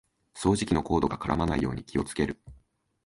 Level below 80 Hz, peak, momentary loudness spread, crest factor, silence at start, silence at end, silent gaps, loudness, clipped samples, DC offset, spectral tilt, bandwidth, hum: -44 dBFS; -8 dBFS; 6 LU; 20 dB; 0.35 s; 0.5 s; none; -28 LUFS; under 0.1%; under 0.1%; -6 dB/octave; 11.5 kHz; none